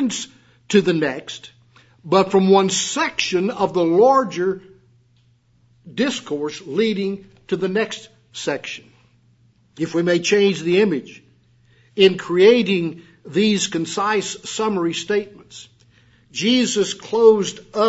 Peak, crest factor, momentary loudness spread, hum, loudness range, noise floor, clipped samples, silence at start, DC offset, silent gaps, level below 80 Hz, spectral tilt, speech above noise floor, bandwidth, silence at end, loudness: 0 dBFS; 18 dB; 18 LU; none; 7 LU; -58 dBFS; under 0.1%; 0 s; under 0.1%; none; -64 dBFS; -4.5 dB/octave; 39 dB; 8 kHz; 0 s; -19 LUFS